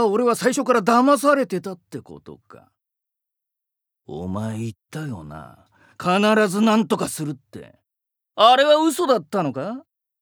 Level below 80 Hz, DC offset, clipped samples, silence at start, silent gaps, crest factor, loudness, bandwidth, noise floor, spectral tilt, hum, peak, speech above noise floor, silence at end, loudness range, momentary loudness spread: -62 dBFS; under 0.1%; under 0.1%; 0 s; none; 20 dB; -19 LUFS; over 20 kHz; -84 dBFS; -4.5 dB/octave; none; -2 dBFS; 64 dB; 0.4 s; 15 LU; 21 LU